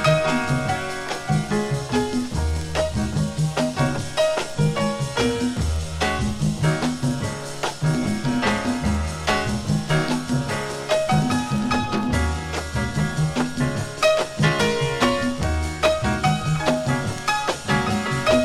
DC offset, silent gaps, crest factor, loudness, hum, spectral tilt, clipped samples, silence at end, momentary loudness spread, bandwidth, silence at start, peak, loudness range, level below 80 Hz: under 0.1%; none; 18 dB; -23 LUFS; none; -5 dB/octave; under 0.1%; 0 s; 5 LU; 14 kHz; 0 s; -4 dBFS; 2 LU; -34 dBFS